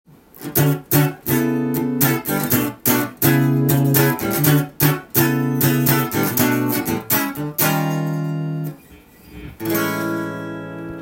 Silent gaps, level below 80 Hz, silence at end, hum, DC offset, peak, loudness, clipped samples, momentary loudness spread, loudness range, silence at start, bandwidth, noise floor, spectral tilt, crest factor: none; -50 dBFS; 0 s; none; under 0.1%; 0 dBFS; -18 LUFS; under 0.1%; 11 LU; 6 LU; 0.35 s; 17 kHz; -45 dBFS; -5 dB/octave; 18 dB